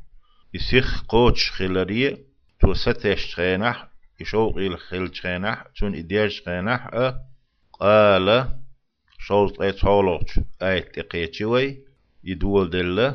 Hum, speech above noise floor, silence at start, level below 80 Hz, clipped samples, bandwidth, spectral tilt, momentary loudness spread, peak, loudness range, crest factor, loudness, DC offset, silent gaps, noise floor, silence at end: none; 31 dB; 0 s; -32 dBFS; under 0.1%; 6.6 kHz; -6.5 dB/octave; 12 LU; -2 dBFS; 5 LU; 20 dB; -22 LUFS; under 0.1%; none; -51 dBFS; 0 s